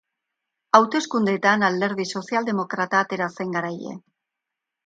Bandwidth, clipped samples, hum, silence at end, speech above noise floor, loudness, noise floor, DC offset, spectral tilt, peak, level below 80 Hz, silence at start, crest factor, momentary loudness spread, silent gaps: 9.2 kHz; under 0.1%; none; 0.9 s; 62 dB; -22 LUFS; -84 dBFS; under 0.1%; -5 dB/octave; 0 dBFS; -72 dBFS; 0.75 s; 22 dB; 12 LU; none